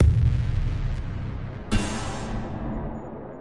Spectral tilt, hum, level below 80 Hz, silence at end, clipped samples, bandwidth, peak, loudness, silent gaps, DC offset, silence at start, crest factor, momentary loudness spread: -6.5 dB/octave; none; -30 dBFS; 0 s; under 0.1%; 11.5 kHz; -8 dBFS; -29 LUFS; none; under 0.1%; 0 s; 16 dB; 12 LU